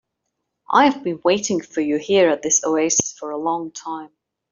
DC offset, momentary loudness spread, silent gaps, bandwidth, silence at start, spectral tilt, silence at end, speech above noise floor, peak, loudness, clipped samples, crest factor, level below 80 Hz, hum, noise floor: under 0.1%; 12 LU; none; 7.6 kHz; 0.7 s; -2.5 dB/octave; 0.45 s; 58 dB; -2 dBFS; -19 LUFS; under 0.1%; 18 dB; -62 dBFS; none; -77 dBFS